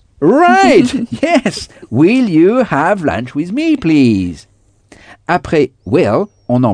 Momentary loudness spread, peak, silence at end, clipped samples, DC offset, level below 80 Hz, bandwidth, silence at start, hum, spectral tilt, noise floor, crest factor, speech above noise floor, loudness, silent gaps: 11 LU; 0 dBFS; 0 s; under 0.1%; under 0.1%; -44 dBFS; 10 kHz; 0.2 s; none; -6.5 dB/octave; -45 dBFS; 12 dB; 34 dB; -12 LUFS; none